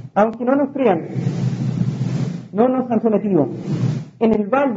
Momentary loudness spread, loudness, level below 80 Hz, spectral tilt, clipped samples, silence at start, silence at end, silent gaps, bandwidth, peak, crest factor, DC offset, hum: 5 LU; -19 LUFS; -54 dBFS; -9 dB/octave; under 0.1%; 0 s; 0 s; none; 7.8 kHz; -2 dBFS; 16 dB; under 0.1%; none